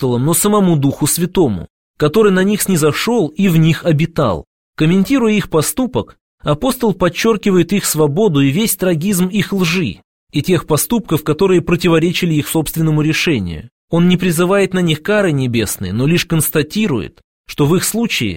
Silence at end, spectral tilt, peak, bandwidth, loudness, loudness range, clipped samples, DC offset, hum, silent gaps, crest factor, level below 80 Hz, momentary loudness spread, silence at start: 0 s; -5 dB/octave; 0 dBFS; 17 kHz; -14 LUFS; 2 LU; under 0.1%; 0.5%; none; 1.70-1.94 s, 4.47-4.73 s, 6.21-6.38 s, 10.04-10.27 s, 13.72-13.88 s, 17.24-17.44 s; 14 dB; -40 dBFS; 6 LU; 0 s